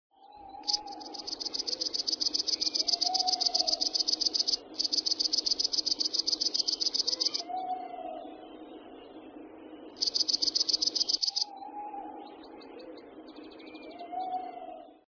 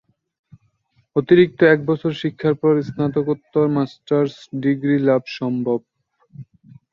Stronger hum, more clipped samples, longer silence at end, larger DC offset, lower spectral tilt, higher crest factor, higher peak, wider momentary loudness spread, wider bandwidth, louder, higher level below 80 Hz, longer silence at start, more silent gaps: neither; neither; second, 0.25 s vs 0.5 s; neither; second, 1.5 dB/octave vs -8.5 dB/octave; about the same, 20 dB vs 18 dB; second, -12 dBFS vs -2 dBFS; first, 23 LU vs 9 LU; second, 5.4 kHz vs 7 kHz; second, -26 LUFS vs -19 LUFS; second, -70 dBFS vs -60 dBFS; second, 0.25 s vs 1.15 s; neither